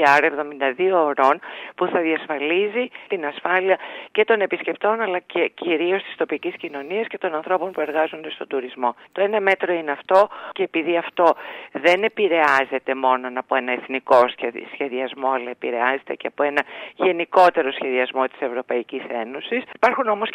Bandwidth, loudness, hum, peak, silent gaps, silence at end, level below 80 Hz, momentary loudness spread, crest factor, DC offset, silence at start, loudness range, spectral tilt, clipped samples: 10.5 kHz; -21 LUFS; none; -2 dBFS; none; 0 s; -72 dBFS; 10 LU; 18 dB; under 0.1%; 0 s; 4 LU; -5 dB/octave; under 0.1%